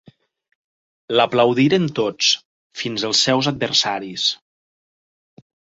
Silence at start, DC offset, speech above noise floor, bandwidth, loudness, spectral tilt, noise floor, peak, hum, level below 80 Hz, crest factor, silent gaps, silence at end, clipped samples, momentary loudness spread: 1.1 s; under 0.1%; over 72 dB; 8 kHz; -18 LUFS; -3.5 dB/octave; under -90 dBFS; -2 dBFS; none; -62 dBFS; 20 dB; 2.45-2.70 s; 1.45 s; under 0.1%; 9 LU